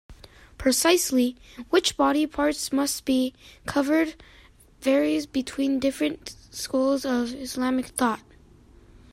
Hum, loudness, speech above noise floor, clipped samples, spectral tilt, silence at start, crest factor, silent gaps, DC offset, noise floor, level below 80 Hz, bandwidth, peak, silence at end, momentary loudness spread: none; -25 LUFS; 28 dB; under 0.1%; -2.5 dB/octave; 0.1 s; 16 dB; none; under 0.1%; -53 dBFS; -52 dBFS; 16 kHz; -8 dBFS; 0.95 s; 9 LU